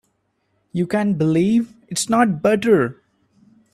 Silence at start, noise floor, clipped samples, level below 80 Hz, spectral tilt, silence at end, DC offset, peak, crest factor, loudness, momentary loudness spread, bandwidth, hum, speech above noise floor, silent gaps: 0.75 s; -68 dBFS; under 0.1%; -58 dBFS; -5.5 dB/octave; 0.8 s; under 0.1%; -2 dBFS; 18 dB; -19 LUFS; 9 LU; 14 kHz; none; 51 dB; none